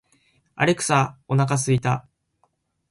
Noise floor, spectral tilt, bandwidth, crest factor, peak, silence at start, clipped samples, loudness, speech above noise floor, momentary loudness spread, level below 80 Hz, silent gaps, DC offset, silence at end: -69 dBFS; -5 dB/octave; 11.5 kHz; 20 dB; -4 dBFS; 0.55 s; under 0.1%; -22 LUFS; 48 dB; 5 LU; -58 dBFS; none; under 0.1%; 0.9 s